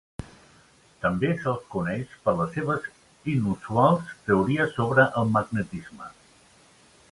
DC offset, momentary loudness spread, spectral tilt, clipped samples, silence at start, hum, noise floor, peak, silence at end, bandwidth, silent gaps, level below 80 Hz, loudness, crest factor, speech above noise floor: under 0.1%; 18 LU; -7.5 dB/octave; under 0.1%; 0.2 s; none; -57 dBFS; -4 dBFS; 1 s; 11.5 kHz; none; -54 dBFS; -25 LUFS; 22 dB; 32 dB